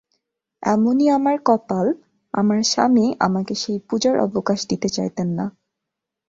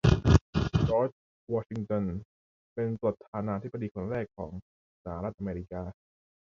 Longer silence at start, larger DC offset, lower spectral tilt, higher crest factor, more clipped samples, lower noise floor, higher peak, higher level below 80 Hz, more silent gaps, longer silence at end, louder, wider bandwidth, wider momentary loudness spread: first, 0.6 s vs 0.05 s; neither; second, -5 dB/octave vs -8 dB/octave; second, 18 dB vs 26 dB; neither; second, -83 dBFS vs under -90 dBFS; about the same, -4 dBFS vs -4 dBFS; second, -60 dBFS vs -40 dBFS; second, none vs 0.41-0.53 s, 1.12-1.47 s, 2.25-2.76 s, 3.28-3.33 s, 3.91-3.95 s, 4.62-5.05 s; first, 0.8 s vs 0.6 s; first, -20 LUFS vs -31 LUFS; about the same, 7.8 kHz vs 7.6 kHz; second, 8 LU vs 17 LU